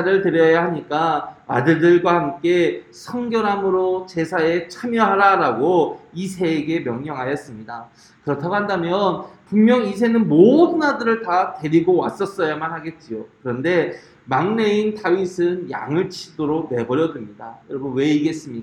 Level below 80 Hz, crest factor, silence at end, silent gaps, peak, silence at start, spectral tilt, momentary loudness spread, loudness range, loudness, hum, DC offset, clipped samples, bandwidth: -60 dBFS; 18 dB; 0 s; none; 0 dBFS; 0 s; -6.5 dB/octave; 15 LU; 6 LU; -19 LUFS; none; under 0.1%; under 0.1%; 11 kHz